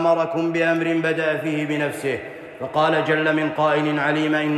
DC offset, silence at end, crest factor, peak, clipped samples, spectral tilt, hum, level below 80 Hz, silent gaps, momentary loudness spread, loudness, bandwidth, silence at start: under 0.1%; 0 s; 14 dB; -6 dBFS; under 0.1%; -6 dB/octave; none; -66 dBFS; none; 7 LU; -21 LUFS; 13.5 kHz; 0 s